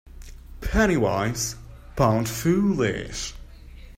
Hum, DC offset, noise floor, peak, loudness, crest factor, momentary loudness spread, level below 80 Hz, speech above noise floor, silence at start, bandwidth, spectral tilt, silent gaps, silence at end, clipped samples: none; under 0.1%; -43 dBFS; -6 dBFS; -24 LUFS; 18 dB; 14 LU; -38 dBFS; 20 dB; 0.05 s; 16 kHz; -5 dB/octave; none; 0.05 s; under 0.1%